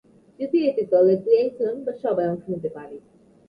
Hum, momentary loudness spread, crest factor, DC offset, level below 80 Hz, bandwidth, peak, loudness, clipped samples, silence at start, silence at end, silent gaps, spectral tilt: none; 15 LU; 16 dB; under 0.1%; -66 dBFS; 5.2 kHz; -6 dBFS; -22 LUFS; under 0.1%; 0.4 s; 0.5 s; none; -9.5 dB/octave